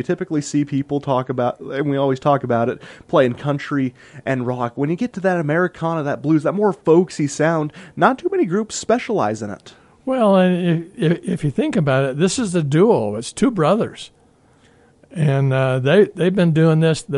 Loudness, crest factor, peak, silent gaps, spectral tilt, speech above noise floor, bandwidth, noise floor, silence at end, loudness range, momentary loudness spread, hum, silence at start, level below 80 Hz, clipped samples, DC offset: -19 LUFS; 18 dB; 0 dBFS; none; -6.5 dB/octave; 36 dB; 11 kHz; -54 dBFS; 0 s; 2 LU; 9 LU; none; 0 s; -54 dBFS; under 0.1%; under 0.1%